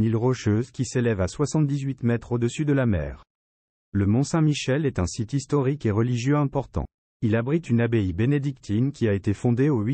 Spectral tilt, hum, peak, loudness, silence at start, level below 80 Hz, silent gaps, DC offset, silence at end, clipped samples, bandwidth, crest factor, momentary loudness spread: -7 dB/octave; none; -10 dBFS; -24 LUFS; 0 s; -46 dBFS; 3.30-3.92 s, 6.94-7.20 s; under 0.1%; 0 s; under 0.1%; 8.8 kHz; 14 dB; 6 LU